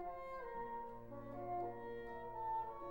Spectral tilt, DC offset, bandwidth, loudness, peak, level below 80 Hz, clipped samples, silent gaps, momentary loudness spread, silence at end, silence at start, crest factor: -8 dB/octave; 0.1%; 16 kHz; -47 LUFS; -34 dBFS; -64 dBFS; under 0.1%; none; 7 LU; 0 s; 0 s; 12 dB